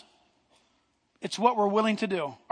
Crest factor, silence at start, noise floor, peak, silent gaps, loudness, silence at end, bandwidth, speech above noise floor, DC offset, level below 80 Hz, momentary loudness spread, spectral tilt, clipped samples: 22 dB; 1.2 s; -71 dBFS; -8 dBFS; none; -27 LUFS; 0.15 s; 10.5 kHz; 44 dB; under 0.1%; -80 dBFS; 11 LU; -5 dB/octave; under 0.1%